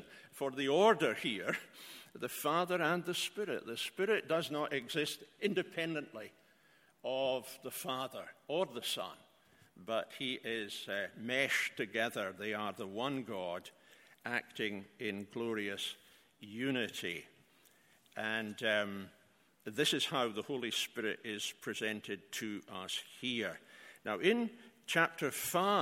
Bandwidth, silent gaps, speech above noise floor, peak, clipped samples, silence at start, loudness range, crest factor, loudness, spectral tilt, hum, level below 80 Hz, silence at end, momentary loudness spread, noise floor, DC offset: 16.5 kHz; none; 31 dB; -14 dBFS; under 0.1%; 0 s; 5 LU; 24 dB; -37 LUFS; -3.5 dB/octave; none; -82 dBFS; 0 s; 14 LU; -69 dBFS; under 0.1%